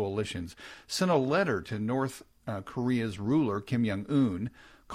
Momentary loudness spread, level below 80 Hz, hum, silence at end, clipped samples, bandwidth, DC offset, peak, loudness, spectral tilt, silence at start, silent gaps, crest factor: 12 LU; -62 dBFS; none; 0 s; under 0.1%; 15.5 kHz; under 0.1%; -14 dBFS; -30 LUFS; -6 dB/octave; 0 s; none; 16 dB